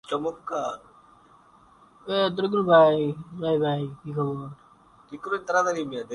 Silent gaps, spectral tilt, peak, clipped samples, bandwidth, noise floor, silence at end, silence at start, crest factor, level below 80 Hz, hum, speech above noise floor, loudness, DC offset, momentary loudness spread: none; -6 dB/octave; -6 dBFS; under 0.1%; 11 kHz; -55 dBFS; 0 s; 0.1 s; 20 dB; -64 dBFS; none; 31 dB; -25 LUFS; under 0.1%; 20 LU